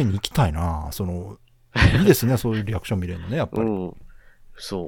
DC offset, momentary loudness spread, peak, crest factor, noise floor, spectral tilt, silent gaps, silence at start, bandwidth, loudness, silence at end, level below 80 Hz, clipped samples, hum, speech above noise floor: under 0.1%; 15 LU; -2 dBFS; 22 dB; -45 dBFS; -6 dB/octave; none; 0 s; 18 kHz; -22 LUFS; 0 s; -36 dBFS; under 0.1%; none; 24 dB